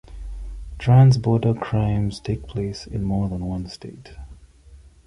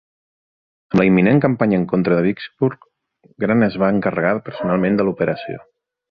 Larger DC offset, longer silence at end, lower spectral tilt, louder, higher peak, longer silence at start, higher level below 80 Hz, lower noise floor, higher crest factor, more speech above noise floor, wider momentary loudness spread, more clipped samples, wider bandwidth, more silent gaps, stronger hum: neither; second, 0.3 s vs 0.5 s; second, -8 dB/octave vs -9.5 dB/octave; second, -21 LUFS vs -18 LUFS; about the same, -4 dBFS vs -2 dBFS; second, 0.1 s vs 0.9 s; first, -38 dBFS vs -52 dBFS; second, -47 dBFS vs -56 dBFS; about the same, 18 dB vs 16 dB; second, 27 dB vs 39 dB; first, 24 LU vs 8 LU; neither; first, 10.5 kHz vs 5.6 kHz; neither; neither